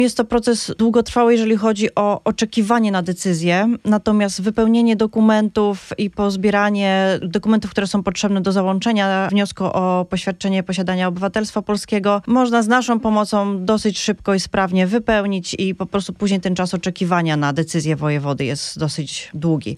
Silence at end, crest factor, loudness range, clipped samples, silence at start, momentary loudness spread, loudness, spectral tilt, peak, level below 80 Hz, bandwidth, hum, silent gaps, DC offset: 0 s; 16 dB; 3 LU; under 0.1%; 0 s; 6 LU; -18 LUFS; -5.5 dB/octave; -2 dBFS; -48 dBFS; 12.5 kHz; none; none; under 0.1%